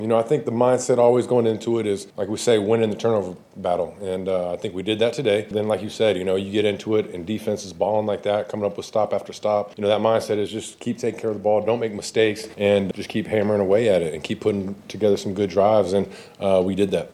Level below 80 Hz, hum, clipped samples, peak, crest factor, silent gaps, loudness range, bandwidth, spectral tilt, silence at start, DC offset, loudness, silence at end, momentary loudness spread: -60 dBFS; none; under 0.1%; -4 dBFS; 18 dB; none; 3 LU; 13.5 kHz; -5.5 dB/octave; 0 s; under 0.1%; -22 LUFS; 0.05 s; 9 LU